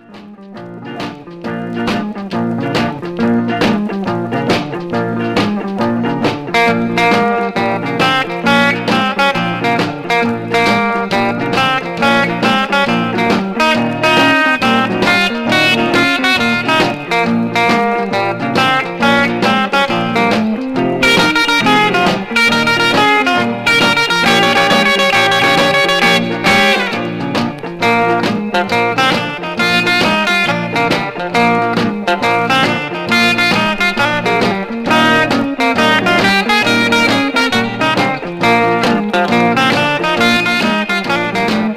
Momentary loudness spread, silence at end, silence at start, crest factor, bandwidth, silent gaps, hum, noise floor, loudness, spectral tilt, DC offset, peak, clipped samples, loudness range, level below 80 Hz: 7 LU; 0 s; 0.1 s; 12 dB; 16 kHz; none; none; -34 dBFS; -12 LUFS; -4.5 dB/octave; 0.2%; 0 dBFS; under 0.1%; 5 LU; -46 dBFS